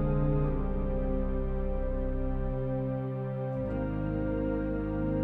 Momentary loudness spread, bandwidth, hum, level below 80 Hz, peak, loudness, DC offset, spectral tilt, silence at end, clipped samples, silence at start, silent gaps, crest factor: 4 LU; 3.7 kHz; none; -34 dBFS; -18 dBFS; -32 LUFS; under 0.1%; -11.5 dB/octave; 0 s; under 0.1%; 0 s; none; 12 dB